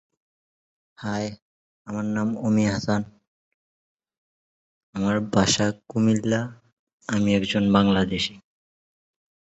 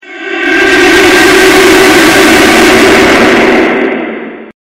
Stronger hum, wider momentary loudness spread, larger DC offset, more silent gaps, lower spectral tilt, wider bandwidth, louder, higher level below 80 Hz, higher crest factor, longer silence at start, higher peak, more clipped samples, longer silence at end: neither; about the same, 14 LU vs 12 LU; neither; first, 1.42-1.85 s, 3.28-3.97 s, 4.18-4.93 s, 6.72-6.87 s, 6.93-6.98 s vs none; first, -5 dB/octave vs -3 dB/octave; second, 8.2 kHz vs 19 kHz; second, -23 LUFS vs -4 LUFS; second, -52 dBFS vs -32 dBFS; first, 22 dB vs 6 dB; first, 1 s vs 0.05 s; second, -4 dBFS vs 0 dBFS; second, under 0.1% vs 5%; first, 1.15 s vs 0.1 s